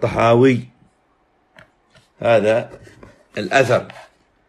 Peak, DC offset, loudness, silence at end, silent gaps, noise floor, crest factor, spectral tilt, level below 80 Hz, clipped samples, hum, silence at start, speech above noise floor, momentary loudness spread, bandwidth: -2 dBFS; under 0.1%; -17 LUFS; 0.45 s; none; -61 dBFS; 18 dB; -6.5 dB/octave; -52 dBFS; under 0.1%; none; 0 s; 45 dB; 18 LU; 12.5 kHz